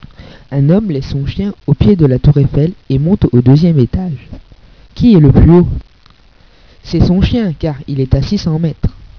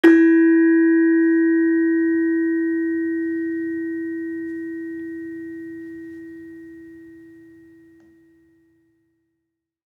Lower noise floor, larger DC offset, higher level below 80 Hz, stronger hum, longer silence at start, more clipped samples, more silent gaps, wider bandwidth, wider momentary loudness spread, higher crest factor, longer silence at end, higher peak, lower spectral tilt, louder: second, -45 dBFS vs -79 dBFS; neither; first, -24 dBFS vs -68 dBFS; neither; first, 0.5 s vs 0.05 s; first, 1% vs under 0.1%; neither; first, 5.4 kHz vs 3.8 kHz; second, 12 LU vs 23 LU; second, 12 dB vs 20 dB; second, 0.1 s vs 2.75 s; about the same, 0 dBFS vs -2 dBFS; first, -9.5 dB/octave vs -6.5 dB/octave; first, -11 LUFS vs -19 LUFS